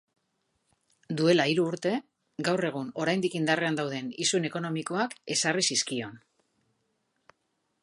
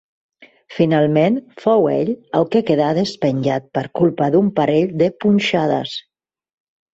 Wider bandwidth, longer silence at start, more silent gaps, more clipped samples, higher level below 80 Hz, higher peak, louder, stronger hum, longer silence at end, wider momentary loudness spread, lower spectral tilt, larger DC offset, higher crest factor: first, 11.5 kHz vs 7.8 kHz; first, 1.1 s vs 0.4 s; neither; neither; second, -76 dBFS vs -58 dBFS; second, -8 dBFS vs -2 dBFS; second, -28 LUFS vs -17 LUFS; neither; first, 1.65 s vs 0.95 s; first, 9 LU vs 6 LU; second, -3.5 dB/octave vs -7 dB/octave; neither; first, 22 dB vs 16 dB